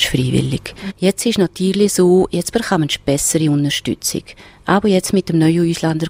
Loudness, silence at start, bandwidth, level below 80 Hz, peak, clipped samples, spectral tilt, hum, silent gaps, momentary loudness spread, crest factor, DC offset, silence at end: -16 LUFS; 0 s; 16 kHz; -42 dBFS; -2 dBFS; under 0.1%; -5 dB/octave; none; none; 8 LU; 14 dB; under 0.1%; 0 s